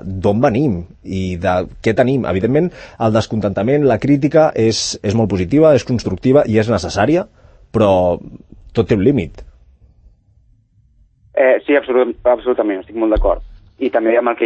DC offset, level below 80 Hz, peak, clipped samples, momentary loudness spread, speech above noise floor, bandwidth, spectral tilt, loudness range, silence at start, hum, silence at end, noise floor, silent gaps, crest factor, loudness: under 0.1%; -34 dBFS; 0 dBFS; under 0.1%; 10 LU; 38 dB; 8.8 kHz; -6.5 dB/octave; 5 LU; 0 s; none; 0 s; -53 dBFS; none; 16 dB; -15 LUFS